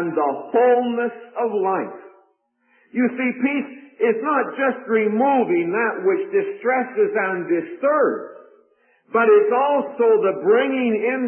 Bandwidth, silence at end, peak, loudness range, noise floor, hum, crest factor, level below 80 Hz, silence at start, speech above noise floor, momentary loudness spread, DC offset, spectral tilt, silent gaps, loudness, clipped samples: 3.3 kHz; 0 s; -6 dBFS; 4 LU; -64 dBFS; none; 14 dB; -80 dBFS; 0 s; 45 dB; 8 LU; under 0.1%; -10.5 dB/octave; none; -20 LUFS; under 0.1%